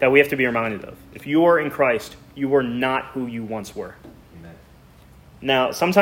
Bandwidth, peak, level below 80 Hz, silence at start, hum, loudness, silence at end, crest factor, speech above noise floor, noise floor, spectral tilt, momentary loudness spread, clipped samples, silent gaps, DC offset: 16.5 kHz; -2 dBFS; -54 dBFS; 0 s; none; -21 LUFS; 0 s; 20 dB; 28 dB; -49 dBFS; -5.5 dB/octave; 18 LU; under 0.1%; none; under 0.1%